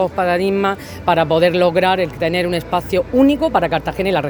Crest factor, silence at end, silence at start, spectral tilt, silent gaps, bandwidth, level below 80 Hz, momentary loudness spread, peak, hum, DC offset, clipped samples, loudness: 16 dB; 0 s; 0 s; -6.5 dB/octave; none; over 20 kHz; -40 dBFS; 5 LU; 0 dBFS; none; under 0.1%; under 0.1%; -16 LUFS